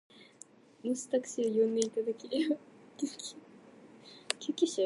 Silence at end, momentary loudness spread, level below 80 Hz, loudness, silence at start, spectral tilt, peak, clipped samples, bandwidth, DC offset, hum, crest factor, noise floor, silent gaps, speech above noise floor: 0 s; 24 LU; -86 dBFS; -34 LUFS; 0.2 s; -3.5 dB/octave; -8 dBFS; under 0.1%; 11.5 kHz; under 0.1%; none; 26 dB; -58 dBFS; none; 26 dB